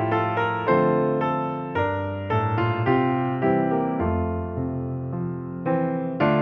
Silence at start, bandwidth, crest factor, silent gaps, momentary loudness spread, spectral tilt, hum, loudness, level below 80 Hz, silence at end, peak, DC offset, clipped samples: 0 s; 6.2 kHz; 16 dB; none; 8 LU; -9.5 dB/octave; none; -24 LUFS; -46 dBFS; 0 s; -8 dBFS; under 0.1%; under 0.1%